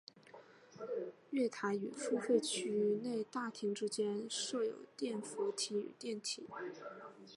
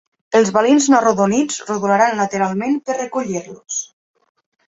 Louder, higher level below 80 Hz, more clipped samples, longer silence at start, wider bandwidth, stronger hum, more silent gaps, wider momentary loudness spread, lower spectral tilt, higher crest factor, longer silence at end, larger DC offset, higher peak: second, -39 LUFS vs -17 LUFS; second, under -90 dBFS vs -60 dBFS; neither; second, 0.15 s vs 0.3 s; first, 11.5 kHz vs 8 kHz; neither; neither; first, 16 LU vs 12 LU; about the same, -3.5 dB/octave vs -4.5 dB/octave; about the same, 20 dB vs 16 dB; second, 0 s vs 0.85 s; neither; second, -20 dBFS vs -2 dBFS